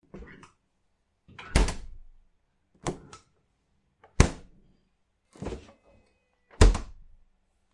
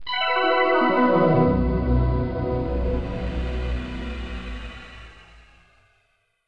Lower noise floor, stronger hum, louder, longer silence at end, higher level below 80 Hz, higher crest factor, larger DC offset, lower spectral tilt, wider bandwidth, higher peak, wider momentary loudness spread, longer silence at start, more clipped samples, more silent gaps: first, -73 dBFS vs -68 dBFS; neither; second, -28 LUFS vs -22 LUFS; first, 0.85 s vs 0.7 s; about the same, -32 dBFS vs -30 dBFS; first, 30 dB vs 16 dB; neither; second, -5 dB/octave vs -8 dB/octave; first, 11.5 kHz vs 6 kHz; first, -2 dBFS vs -8 dBFS; first, 26 LU vs 17 LU; first, 0.15 s vs 0 s; neither; neither